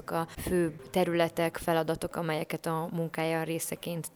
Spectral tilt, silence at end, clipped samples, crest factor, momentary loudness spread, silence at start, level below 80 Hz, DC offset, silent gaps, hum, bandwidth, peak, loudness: -5 dB/octave; 0.1 s; under 0.1%; 18 dB; 6 LU; 0 s; -54 dBFS; under 0.1%; none; none; over 20 kHz; -12 dBFS; -31 LUFS